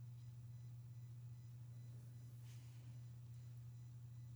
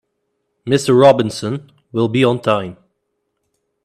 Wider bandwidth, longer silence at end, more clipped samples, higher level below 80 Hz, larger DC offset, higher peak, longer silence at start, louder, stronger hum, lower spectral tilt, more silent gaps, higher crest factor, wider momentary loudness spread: first, over 20 kHz vs 13.5 kHz; second, 0 s vs 1.1 s; neither; second, -78 dBFS vs -58 dBFS; neither; second, -48 dBFS vs 0 dBFS; second, 0 s vs 0.65 s; second, -57 LUFS vs -15 LUFS; neither; about the same, -6.5 dB/octave vs -6 dB/octave; neither; second, 8 dB vs 18 dB; second, 1 LU vs 17 LU